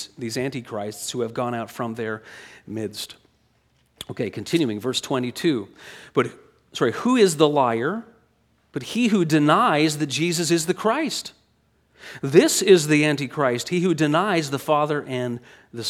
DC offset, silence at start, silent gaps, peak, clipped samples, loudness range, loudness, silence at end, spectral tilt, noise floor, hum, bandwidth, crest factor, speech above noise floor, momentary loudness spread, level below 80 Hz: under 0.1%; 0 s; none; 0 dBFS; under 0.1%; 10 LU; -22 LUFS; 0 s; -4.5 dB/octave; -64 dBFS; none; 16.5 kHz; 22 dB; 42 dB; 18 LU; -68 dBFS